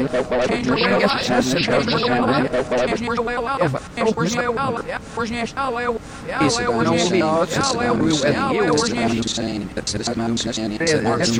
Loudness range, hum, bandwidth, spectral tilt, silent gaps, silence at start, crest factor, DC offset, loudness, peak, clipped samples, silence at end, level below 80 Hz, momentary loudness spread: 3 LU; none; 16.5 kHz; -4.5 dB/octave; none; 0 s; 16 dB; under 0.1%; -20 LUFS; -4 dBFS; under 0.1%; 0 s; -44 dBFS; 6 LU